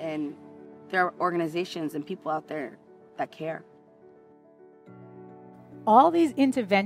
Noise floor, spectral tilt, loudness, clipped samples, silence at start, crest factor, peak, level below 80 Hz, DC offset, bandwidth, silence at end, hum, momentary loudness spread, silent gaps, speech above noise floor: -55 dBFS; -6 dB/octave; -26 LUFS; under 0.1%; 0 s; 22 dB; -6 dBFS; -76 dBFS; under 0.1%; 14.5 kHz; 0 s; none; 27 LU; none; 30 dB